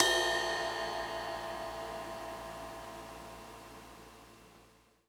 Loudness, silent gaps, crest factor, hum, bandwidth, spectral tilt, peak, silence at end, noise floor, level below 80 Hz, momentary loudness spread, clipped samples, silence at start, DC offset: -37 LUFS; none; 30 dB; none; over 20 kHz; -1.5 dB/octave; -8 dBFS; 0.4 s; -64 dBFS; -60 dBFS; 22 LU; under 0.1%; 0 s; under 0.1%